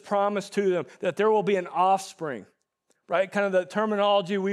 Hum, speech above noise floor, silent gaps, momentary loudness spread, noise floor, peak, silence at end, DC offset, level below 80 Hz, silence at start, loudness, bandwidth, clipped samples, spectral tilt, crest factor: none; 48 dB; none; 9 LU; -72 dBFS; -10 dBFS; 0 s; under 0.1%; -88 dBFS; 0.05 s; -25 LUFS; 13 kHz; under 0.1%; -5 dB/octave; 16 dB